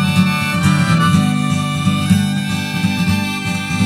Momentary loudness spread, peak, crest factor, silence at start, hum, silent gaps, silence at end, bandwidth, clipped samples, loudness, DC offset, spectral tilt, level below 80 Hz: 6 LU; 0 dBFS; 14 dB; 0 s; none; none; 0 s; 15 kHz; under 0.1%; -16 LUFS; under 0.1%; -5.5 dB/octave; -42 dBFS